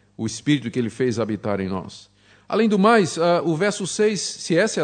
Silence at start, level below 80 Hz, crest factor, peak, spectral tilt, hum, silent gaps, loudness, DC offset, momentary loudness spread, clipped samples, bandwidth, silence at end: 0.2 s; -64 dBFS; 16 dB; -4 dBFS; -5 dB/octave; none; none; -21 LUFS; under 0.1%; 10 LU; under 0.1%; 9.4 kHz; 0 s